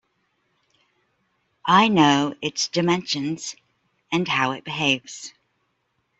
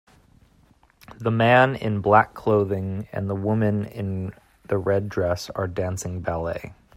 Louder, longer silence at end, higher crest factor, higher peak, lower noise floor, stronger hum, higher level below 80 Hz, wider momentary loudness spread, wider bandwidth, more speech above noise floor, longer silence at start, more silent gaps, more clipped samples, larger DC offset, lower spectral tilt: about the same, -21 LUFS vs -23 LUFS; first, 0.9 s vs 0.25 s; about the same, 20 dB vs 20 dB; about the same, -4 dBFS vs -2 dBFS; first, -72 dBFS vs -58 dBFS; neither; second, -66 dBFS vs -52 dBFS; first, 16 LU vs 12 LU; second, 8.2 kHz vs 15.5 kHz; first, 51 dB vs 36 dB; first, 1.65 s vs 1.1 s; neither; neither; neither; second, -4 dB/octave vs -6.5 dB/octave